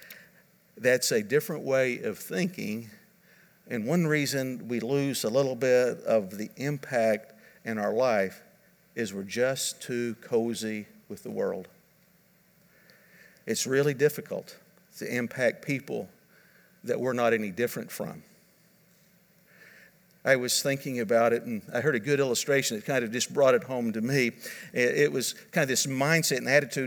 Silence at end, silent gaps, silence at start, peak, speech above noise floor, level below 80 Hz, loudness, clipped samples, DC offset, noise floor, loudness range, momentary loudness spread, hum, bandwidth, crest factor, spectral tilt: 0 s; none; 0 s; -8 dBFS; 35 dB; -78 dBFS; -28 LUFS; under 0.1%; under 0.1%; -63 dBFS; 6 LU; 13 LU; none; over 20 kHz; 22 dB; -4 dB/octave